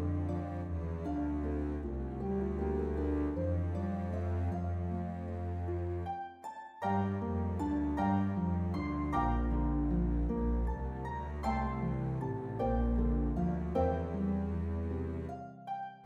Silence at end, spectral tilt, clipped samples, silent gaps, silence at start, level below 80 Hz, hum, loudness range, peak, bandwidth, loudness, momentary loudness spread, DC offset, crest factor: 0 s; -9.5 dB/octave; under 0.1%; none; 0 s; -40 dBFS; none; 3 LU; -20 dBFS; 7.6 kHz; -35 LUFS; 7 LU; under 0.1%; 14 dB